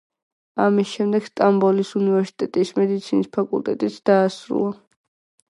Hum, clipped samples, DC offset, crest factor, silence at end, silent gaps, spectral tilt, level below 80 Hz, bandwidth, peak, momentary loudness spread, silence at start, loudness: none; under 0.1%; under 0.1%; 18 dB; 0.75 s; none; -7 dB/octave; -70 dBFS; 11 kHz; -2 dBFS; 6 LU; 0.55 s; -21 LUFS